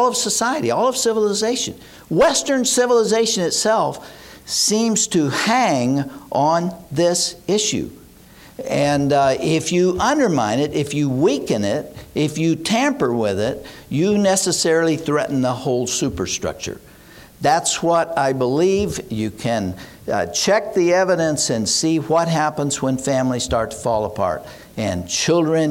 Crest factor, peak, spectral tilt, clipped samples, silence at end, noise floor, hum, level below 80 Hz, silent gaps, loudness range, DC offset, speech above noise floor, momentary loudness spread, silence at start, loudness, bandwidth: 12 dB; -6 dBFS; -4 dB/octave; under 0.1%; 0 s; -44 dBFS; none; -48 dBFS; none; 3 LU; under 0.1%; 26 dB; 8 LU; 0 s; -19 LUFS; 17 kHz